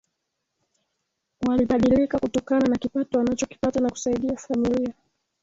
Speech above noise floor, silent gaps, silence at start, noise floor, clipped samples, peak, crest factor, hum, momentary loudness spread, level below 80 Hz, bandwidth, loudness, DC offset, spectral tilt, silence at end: 57 dB; none; 1.4 s; -79 dBFS; under 0.1%; -10 dBFS; 16 dB; none; 7 LU; -50 dBFS; 7.8 kHz; -24 LUFS; under 0.1%; -6 dB/octave; 0.5 s